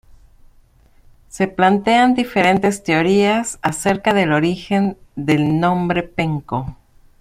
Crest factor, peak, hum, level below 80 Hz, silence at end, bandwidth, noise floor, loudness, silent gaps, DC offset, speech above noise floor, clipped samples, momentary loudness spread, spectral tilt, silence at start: 16 dB; -2 dBFS; none; -46 dBFS; 0.45 s; 15.5 kHz; -51 dBFS; -17 LUFS; none; under 0.1%; 34 dB; under 0.1%; 9 LU; -5.5 dB/octave; 1.35 s